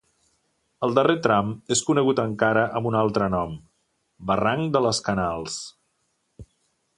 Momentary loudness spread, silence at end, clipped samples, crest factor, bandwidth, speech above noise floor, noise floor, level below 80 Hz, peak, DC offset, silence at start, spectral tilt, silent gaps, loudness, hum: 12 LU; 0.55 s; under 0.1%; 22 dB; 11.5 kHz; 50 dB; -72 dBFS; -52 dBFS; -4 dBFS; under 0.1%; 0.8 s; -4.5 dB/octave; none; -23 LUFS; none